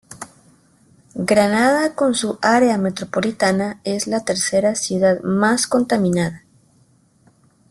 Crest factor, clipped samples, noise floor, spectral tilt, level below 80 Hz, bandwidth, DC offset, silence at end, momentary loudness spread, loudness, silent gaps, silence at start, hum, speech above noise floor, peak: 18 dB; under 0.1%; -56 dBFS; -4.5 dB/octave; -58 dBFS; 12.5 kHz; under 0.1%; 1.35 s; 9 LU; -18 LUFS; none; 0.1 s; none; 39 dB; -2 dBFS